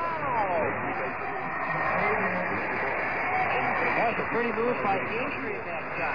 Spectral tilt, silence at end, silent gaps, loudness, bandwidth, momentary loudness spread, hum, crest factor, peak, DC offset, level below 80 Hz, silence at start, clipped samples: -7.5 dB/octave; 0 s; none; -27 LUFS; 5.2 kHz; 6 LU; none; 16 dB; -14 dBFS; 0.7%; -56 dBFS; 0 s; under 0.1%